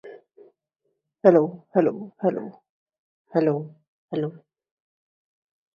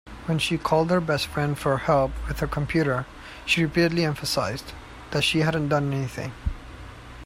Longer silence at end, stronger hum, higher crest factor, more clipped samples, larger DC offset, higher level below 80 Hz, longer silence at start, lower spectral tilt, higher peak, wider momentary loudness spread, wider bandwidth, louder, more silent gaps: first, 1.4 s vs 0 s; neither; first, 24 dB vs 18 dB; neither; neither; second, -74 dBFS vs -40 dBFS; about the same, 0.05 s vs 0.05 s; first, -10 dB/octave vs -5.5 dB/octave; first, -2 dBFS vs -6 dBFS; about the same, 16 LU vs 15 LU; second, 6.8 kHz vs 16 kHz; about the same, -23 LUFS vs -24 LUFS; first, 2.69-2.86 s, 2.99-3.25 s, 3.88-4.08 s vs none